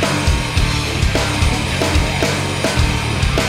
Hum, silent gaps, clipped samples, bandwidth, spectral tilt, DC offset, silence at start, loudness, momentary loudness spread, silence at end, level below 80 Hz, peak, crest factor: none; none; under 0.1%; 16 kHz; -4.5 dB/octave; under 0.1%; 0 s; -17 LUFS; 1 LU; 0 s; -22 dBFS; -2 dBFS; 14 dB